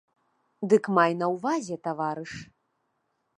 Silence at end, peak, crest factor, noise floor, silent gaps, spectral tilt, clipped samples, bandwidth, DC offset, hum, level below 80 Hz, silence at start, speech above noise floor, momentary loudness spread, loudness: 0.95 s; -8 dBFS; 22 dB; -76 dBFS; none; -6 dB/octave; under 0.1%; 10.5 kHz; under 0.1%; none; -70 dBFS; 0.6 s; 50 dB; 15 LU; -26 LUFS